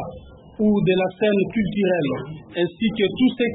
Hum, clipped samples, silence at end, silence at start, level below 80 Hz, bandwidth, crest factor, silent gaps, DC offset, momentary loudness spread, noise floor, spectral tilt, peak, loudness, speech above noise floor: none; under 0.1%; 0 s; 0 s; -50 dBFS; 4 kHz; 14 dB; none; under 0.1%; 7 LU; -41 dBFS; -11.5 dB/octave; -8 dBFS; -21 LUFS; 21 dB